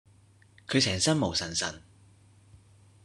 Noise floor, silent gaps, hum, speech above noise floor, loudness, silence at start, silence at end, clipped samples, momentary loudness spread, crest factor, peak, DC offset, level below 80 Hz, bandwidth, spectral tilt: -59 dBFS; none; none; 31 dB; -27 LUFS; 0.7 s; 1.25 s; under 0.1%; 19 LU; 22 dB; -10 dBFS; under 0.1%; -58 dBFS; 12.5 kHz; -3.5 dB/octave